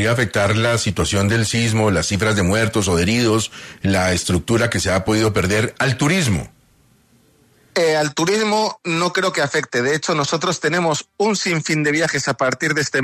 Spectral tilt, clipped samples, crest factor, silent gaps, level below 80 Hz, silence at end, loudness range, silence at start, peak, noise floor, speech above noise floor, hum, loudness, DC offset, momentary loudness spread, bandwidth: -4.5 dB/octave; under 0.1%; 14 dB; none; -44 dBFS; 0 s; 3 LU; 0 s; -4 dBFS; -55 dBFS; 37 dB; none; -18 LUFS; under 0.1%; 3 LU; 14 kHz